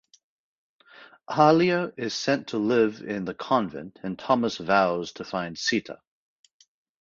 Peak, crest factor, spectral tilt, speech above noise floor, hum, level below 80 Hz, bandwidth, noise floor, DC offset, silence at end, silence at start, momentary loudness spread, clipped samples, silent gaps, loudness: -4 dBFS; 22 dB; -5 dB/octave; 27 dB; none; -64 dBFS; 7.6 kHz; -52 dBFS; under 0.1%; 1.1 s; 1 s; 14 LU; under 0.1%; none; -25 LUFS